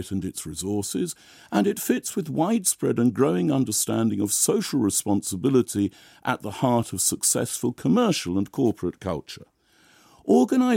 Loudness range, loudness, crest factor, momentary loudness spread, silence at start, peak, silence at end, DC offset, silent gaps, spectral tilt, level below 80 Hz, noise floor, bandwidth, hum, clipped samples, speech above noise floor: 2 LU; -24 LUFS; 18 dB; 10 LU; 0 s; -6 dBFS; 0 s; under 0.1%; none; -4.5 dB/octave; -58 dBFS; -58 dBFS; 16.5 kHz; none; under 0.1%; 35 dB